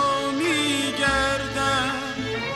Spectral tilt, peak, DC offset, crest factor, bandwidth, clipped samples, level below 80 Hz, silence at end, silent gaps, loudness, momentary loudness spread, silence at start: -3 dB/octave; -8 dBFS; under 0.1%; 16 dB; 15 kHz; under 0.1%; -44 dBFS; 0 s; none; -23 LUFS; 6 LU; 0 s